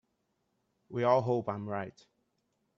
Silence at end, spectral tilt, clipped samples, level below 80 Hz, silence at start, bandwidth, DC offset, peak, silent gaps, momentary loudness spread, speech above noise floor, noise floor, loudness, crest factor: 0.9 s; -8 dB/octave; under 0.1%; -76 dBFS; 0.9 s; 7.2 kHz; under 0.1%; -12 dBFS; none; 13 LU; 48 dB; -79 dBFS; -32 LUFS; 22 dB